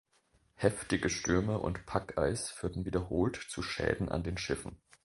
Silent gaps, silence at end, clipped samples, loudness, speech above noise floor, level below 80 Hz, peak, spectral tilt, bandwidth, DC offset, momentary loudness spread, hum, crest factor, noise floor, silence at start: none; 0.3 s; under 0.1%; -34 LUFS; 38 dB; -48 dBFS; -12 dBFS; -5 dB/octave; 11.5 kHz; under 0.1%; 7 LU; none; 22 dB; -71 dBFS; 0.6 s